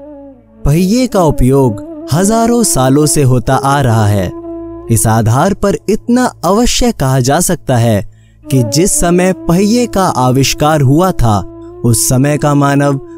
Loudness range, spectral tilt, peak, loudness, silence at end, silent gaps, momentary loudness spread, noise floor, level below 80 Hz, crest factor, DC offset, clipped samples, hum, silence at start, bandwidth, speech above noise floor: 2 LU; -5.5 dB/octave; 0 dBFS; -11 LUFS; 0 s; none; 6 LU; -34 dBFS; -26 dBFS; 10 dB; under 0.1%; under 0.1%; none; 0 s; 16 kHz; 25 dB